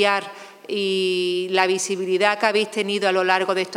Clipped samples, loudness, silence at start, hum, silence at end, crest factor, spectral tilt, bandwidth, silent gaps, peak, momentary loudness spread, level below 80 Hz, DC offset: under 0.1%; -21 LUFS; 0 s; none; 0 s; 18 dB; -3 dB/octave; 15 kHz; none; -4 dBFS; 7 LU; -80 dBFS; under 0.1%